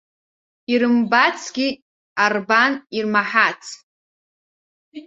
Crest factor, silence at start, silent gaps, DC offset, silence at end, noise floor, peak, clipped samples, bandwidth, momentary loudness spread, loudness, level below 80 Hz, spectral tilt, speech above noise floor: 20 dB; 0.7 s; 1.82-2.16 s, 3.83-4.92 s; under 0.1%; 0.05 s; under -90 dBFS; -2 dBFS; under 0.1%; 7.8 kHz; 16 LU; -18 LUFS; -68 dBFS; -3.5 dB/octave; over 72 dB